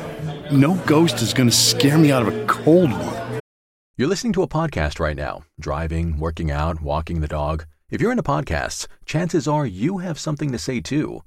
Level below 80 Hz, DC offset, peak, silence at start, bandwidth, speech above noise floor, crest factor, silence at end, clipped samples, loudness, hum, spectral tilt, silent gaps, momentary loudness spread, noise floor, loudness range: -34 dBFS; under 0.1%; -4 dBFS; 0 s; 16.5 kHz; over 70 dB; 16 dB; 0.05 s; under 0.1%; -20 LUFS; none; -5 dB/octave; 3.40-3.94 s; 14 LU; under -90 dBFS; 8 LU